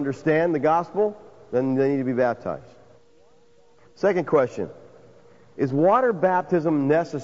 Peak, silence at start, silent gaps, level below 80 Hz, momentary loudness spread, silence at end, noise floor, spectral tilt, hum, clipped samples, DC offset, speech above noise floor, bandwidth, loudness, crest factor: -6 dBFS; 0 s; none; -64 dBFS; 9 LU; 0 s; -58 dBFS; -8 dB/octave; none; under 0.1%; 0.2%; 36 dB; 7.8 kHz; -22 LUFS; 16 dB